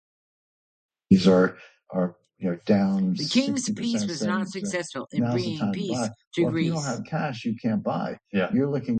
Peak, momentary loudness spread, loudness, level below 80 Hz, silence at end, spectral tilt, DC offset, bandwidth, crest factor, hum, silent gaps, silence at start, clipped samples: -6 dBFS; 9 LU; -25 LUFS; -60 dBFS; 0 s; -6 dB/octave; under 0.1%; 9.2 kHz; 20 dB; none; 6.27-6.31 s; 1.1 s; under 0.1%